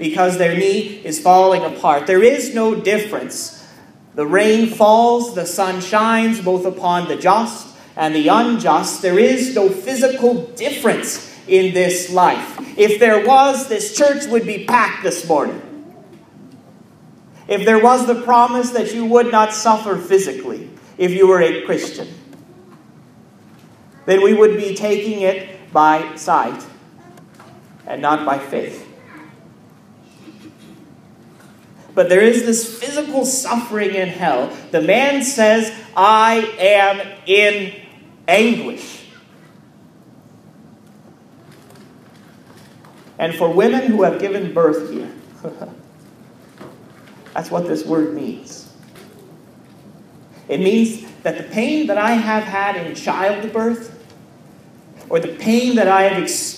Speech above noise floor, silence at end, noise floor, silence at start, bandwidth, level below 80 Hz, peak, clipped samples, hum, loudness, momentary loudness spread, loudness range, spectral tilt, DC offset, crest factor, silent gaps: 30 dB; 0 s; -45 dBFS; 0 s; 15.5 kHz; -68 dBFS; 0 dBFS; under 0.1%; none; -15 LUFS; 16 LU; 10 LU; -4 dB/octave; under 0.1%; 16 dB; none